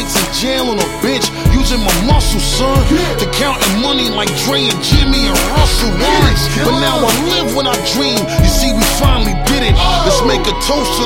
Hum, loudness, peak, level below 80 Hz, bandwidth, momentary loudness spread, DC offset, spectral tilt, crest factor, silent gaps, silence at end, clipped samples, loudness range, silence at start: none; -12 LUFS; 0 dBFS; -18 dBFS; 16.5 kHz; 3 LU; under 0.1%; -4 dB/octave; 12 dB; none; 0 s; under 0.1%; 1 LU; 0 s